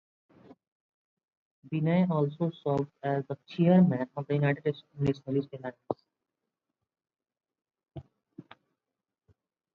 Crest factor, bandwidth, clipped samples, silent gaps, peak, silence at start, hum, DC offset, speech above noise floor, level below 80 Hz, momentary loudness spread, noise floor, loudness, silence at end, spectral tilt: 20 dB; 4.9 kHz; under 0.1%; none; -12 dBFS; 1.65 s; none; under 0.1%; 61 dB; -68 dBFS; 17 LU; -89 dBFS; -29 LUFS; 1.35 s; -10 dB/octave